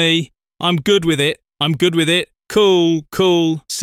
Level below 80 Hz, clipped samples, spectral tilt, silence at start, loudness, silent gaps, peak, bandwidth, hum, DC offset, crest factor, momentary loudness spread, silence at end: -52 dBFS; under 0.1%; -4.5 dB/octave; 0 s; -16 LUFS; none; -2 dBFS; 15.5 kHz; none; under 0.1%; 14 dB; 7 LU; 0 s